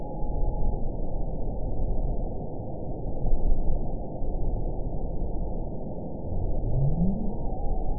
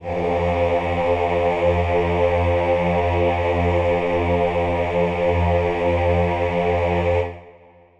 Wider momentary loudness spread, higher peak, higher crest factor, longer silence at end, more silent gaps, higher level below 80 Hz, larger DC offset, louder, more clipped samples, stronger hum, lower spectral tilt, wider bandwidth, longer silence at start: first, 8 LU vs 2 LU; second, -10 dBFS vs -6 dBFS; about the same, 14 dB vs 14 dB; second, 0 s vs 0.5 s; neither; first, -28 dBFS vs -34 dBFS; first, 2% vs under 0.1%; second, -33 LUFS vs -20 LUFS; neither; neither; first, -17.5 dB/octave vs -8 dB/octave; second, 1 kHz vs 7.6 kHz; about the same, 0 s vs 0 s